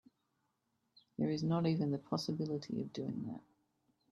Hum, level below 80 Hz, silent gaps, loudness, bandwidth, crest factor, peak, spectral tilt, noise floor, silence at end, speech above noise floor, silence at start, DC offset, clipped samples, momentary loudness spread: none; -76 dBFS; none; -38 LUFS; 12 kHz; 20 dB; -20 dBFS; -7.5 dB/octave; -83 dBFS; 0.7 s; 46 dB; 1.2 s; under 0.1%; under 0.1%; 11 LU